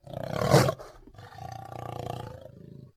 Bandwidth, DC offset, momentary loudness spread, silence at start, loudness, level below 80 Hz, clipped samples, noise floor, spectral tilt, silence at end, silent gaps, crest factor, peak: 16 kHz; under 0.1%; 26 LU; 0.05 s; -28 LUFS; -54 dBFS; under 0.1%; -49 dBFS; -5.5 dB/octave; 0.1 s; none; 24 dB; -6 dBFS